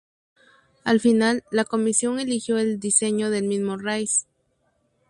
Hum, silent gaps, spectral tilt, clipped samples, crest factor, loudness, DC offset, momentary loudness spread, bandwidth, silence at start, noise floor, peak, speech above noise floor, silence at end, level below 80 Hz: none; none; -3.5 dB/octave; under 0.1%; 18 dB; -22 LUFS; under 0.1%; 7 LU; 11.5 kHz; 0.85 s; -69 dBFS; -4 dBFS; 47 dB; 0.85 s; -66 dBFS